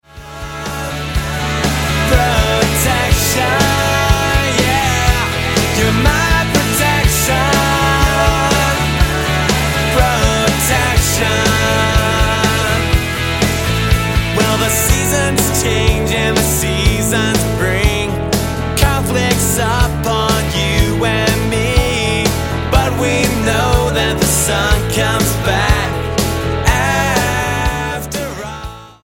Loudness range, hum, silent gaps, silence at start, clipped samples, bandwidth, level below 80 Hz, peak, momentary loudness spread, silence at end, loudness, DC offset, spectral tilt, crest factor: 2 LU; none; none; 0.15 s; under 0.1%; 17 kHz; -22 dBFS; 0 dBFS; 5 LU; 0.1 s; -14 LUFS; under 0.1%; -4 dB/octave; 14 dB